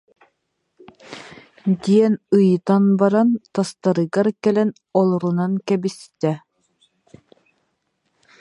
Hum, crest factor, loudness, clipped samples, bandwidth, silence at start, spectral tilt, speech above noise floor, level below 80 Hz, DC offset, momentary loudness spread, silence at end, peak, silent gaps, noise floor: none; 18 dB; -19 LUFS; under 0.1%; 11 kHz; 1.1 s; -8 dB/octave; 55 dB; -68 dBFS; under 0.1%; 12 LU; 2 s; -2 dBFS; none; -73 dBFS